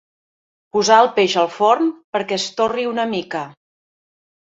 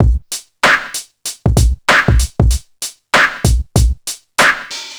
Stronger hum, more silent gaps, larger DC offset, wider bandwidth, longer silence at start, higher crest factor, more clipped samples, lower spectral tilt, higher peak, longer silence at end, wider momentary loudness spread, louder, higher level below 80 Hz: neither; first, 2.04-2.13 s vs none; neither; second, 8 kHz vs over 20 kHz; first, 0.75 s vs 0 s; about the same, 18 dB vs 14 dB; neither; about the same, -3.5 dB/octave vs -4 dB/octave; about the same, -2 dBFS vs 0 dBFS; first, 1.1 s vs 0 s; about the same, 12 LU vs 13 LU; second, -18 LUFS vs -14 LUFS; second, -64 dBFS vs -18 dBFS